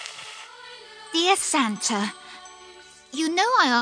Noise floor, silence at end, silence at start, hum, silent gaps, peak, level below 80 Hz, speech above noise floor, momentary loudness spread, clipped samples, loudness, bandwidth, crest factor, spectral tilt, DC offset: -48 dBFS; 0 s; 0 s; none; none; -6 dBFS; -72 dBFS; 26 dB; 22 LU; under 0.1%; -22 LUFS; 10.5 kHz; 20 dB; -1.5 dB/octave; under 0.1%